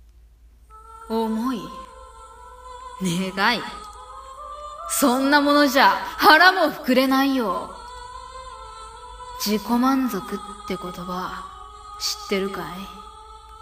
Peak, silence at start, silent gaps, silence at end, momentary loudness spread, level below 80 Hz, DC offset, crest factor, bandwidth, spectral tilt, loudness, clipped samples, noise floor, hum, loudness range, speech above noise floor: 0 dBFS; 0.7 s; none; 0.05 s; 23 LU; -50 dBFS; under 0.1%; 22 dB; 15.5 kHz; -3.5 dB/octave; -20 LUFS; under 0.1%; -50 dBFS; none; 12 LU; 30 dB